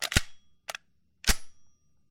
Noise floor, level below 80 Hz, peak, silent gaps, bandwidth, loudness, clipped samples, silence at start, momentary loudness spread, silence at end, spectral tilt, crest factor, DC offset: -57 dBFS; -38 dBFS; -6 dBFS; none; 17 kHz; -31 LUFS; under 0.1%; 0 s; 16 LU; 0.45 s; -2 dB/octave; 26 dB; under 0.1%